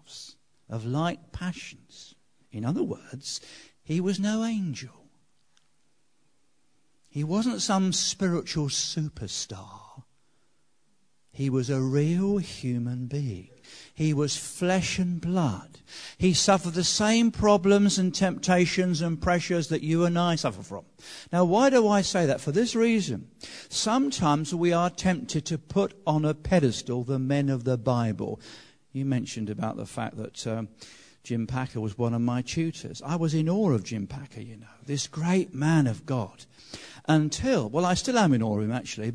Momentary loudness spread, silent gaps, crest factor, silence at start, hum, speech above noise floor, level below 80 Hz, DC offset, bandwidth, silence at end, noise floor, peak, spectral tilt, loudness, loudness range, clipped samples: 17 LU; none; 20 dB; 0.1 s; none; 46 dB; -54 dBFS; under 0.1%; 11 kHz; 0 s; -73 dBFS; -8 dBFS; -5 dB/octave; -26 LUFS; 9 LU; under 0.1%